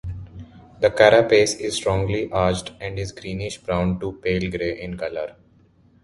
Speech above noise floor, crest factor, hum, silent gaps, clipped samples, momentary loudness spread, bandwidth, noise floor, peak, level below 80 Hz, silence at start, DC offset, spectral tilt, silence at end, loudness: 35 dB; 22 dB; none; none; under 0.1%; 16 LU; 11.5 kHz; -56 dBFS; 0 dBFS; -42 dBFS; 0.05 s; under 0.1%; -5 dB/octave; 0.7 s; -21 LUFS